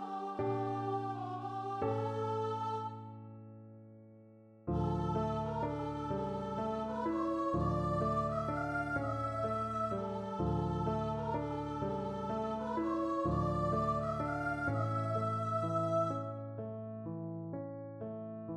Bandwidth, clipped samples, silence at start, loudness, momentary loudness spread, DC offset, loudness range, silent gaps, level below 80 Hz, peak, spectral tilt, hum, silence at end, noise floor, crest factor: 9.8 kHz; under 0.1%; 0 s; -37 LUFS; 10 LU; under 0.1%; 5 LU; none; -54 dBFS; -22 dBFS; -8.5 dB/octave; none; 0 s; -59 dBFS; 14 dB